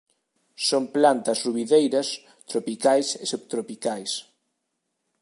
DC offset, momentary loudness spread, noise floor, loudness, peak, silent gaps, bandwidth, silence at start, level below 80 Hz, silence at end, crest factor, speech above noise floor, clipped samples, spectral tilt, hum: under 0.1%; 11 LU; -78 dBFS; -24 LUFS; -4 dBFS; none; 11.5 kHz; 0.6 s; -80 dBFS; 1 s; 20 dB; 55 dB; under 0.1%; -3 dB/octave; none